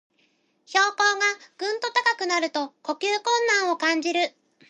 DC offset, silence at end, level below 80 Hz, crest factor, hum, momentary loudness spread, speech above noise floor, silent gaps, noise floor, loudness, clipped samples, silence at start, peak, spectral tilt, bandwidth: under 0.1%; 0.4 s; -86 dBFS; 22 dB; none; 9 LU; 43 dB; none; -67 dBFS; -23 LUFS; under 0.1%; 0.7 s; -4 dBFS; 0.5 dB/octave; 10.5 kHz